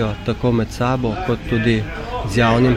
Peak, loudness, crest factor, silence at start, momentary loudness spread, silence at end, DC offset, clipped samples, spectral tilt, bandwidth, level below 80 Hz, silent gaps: -2 dBFS; -19 LUFS; 14 dB; 0 s; 6 LU; 0 s; under 0.1%; under 0.1%; -7 dB/octave; 13.5 kHz; -32 dBFS; none